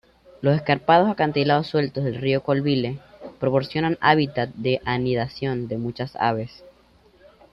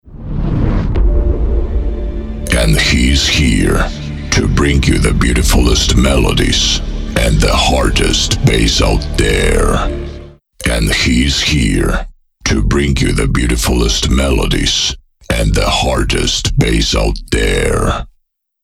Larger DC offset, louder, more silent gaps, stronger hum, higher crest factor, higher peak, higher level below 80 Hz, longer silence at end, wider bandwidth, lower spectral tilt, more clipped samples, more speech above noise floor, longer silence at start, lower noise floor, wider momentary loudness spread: neither; second, -22 LUFS vs -13 LUFS; neither; neither; first, 20 dB vs 12 dB; second, -4 dBFS vs 0 dBFS; second, -56 dBFS vs -16 dBFS; first, 1.05 s vs 0.55 s; second, 6 kHz vs 15.5 kHz; first, -8.5 dB/octave vs -4 dB/octave; neither; second, 34 dB vs 48 dB; first, 0.4 s vs 0.05 s; second, -56 dBFS vs -60 dBFS; about the same, 11 LU vs 9 LU